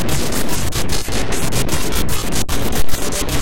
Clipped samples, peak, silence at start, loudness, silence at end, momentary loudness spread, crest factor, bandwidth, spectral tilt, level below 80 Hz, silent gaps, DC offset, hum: under 0.1%; -2 dBFS; 0 s; -20 LUFS; 0 s; 2 LU; 12 dB; 17.5 kHz; -3.5 dB/octave; -26 dBFS; none; 20%; none